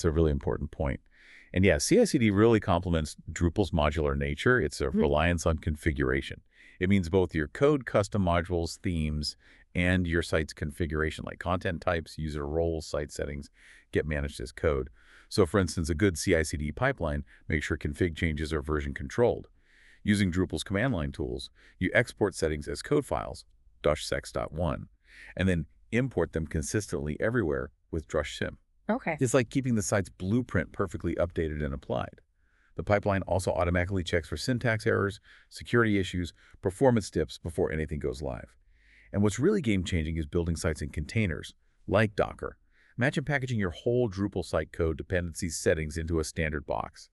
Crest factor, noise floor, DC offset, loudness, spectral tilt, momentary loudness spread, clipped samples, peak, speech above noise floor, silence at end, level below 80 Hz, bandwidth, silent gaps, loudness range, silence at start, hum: 22 dB; -65 dBFS; under 0.1%; -29 LUFS; -6 dB/octave; 10 LU; under 0.1%; -8 dBFS; 37 dB; 0.1 s; -42 dBFS; 12.5 kHz; none; 5 LU; 0 s; none